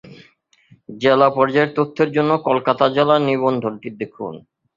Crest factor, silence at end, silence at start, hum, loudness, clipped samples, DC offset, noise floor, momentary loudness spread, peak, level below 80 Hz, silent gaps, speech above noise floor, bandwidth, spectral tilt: 18 dB; 0.35 s; 0.1 s; none; -17 LUFS; under 0.1%; under 0.1%; -55 dBFS; 14 LU; 0 dBFS; -60 dBFS; none; 37 dB; 7.4 kHz; -7.5 dB/octave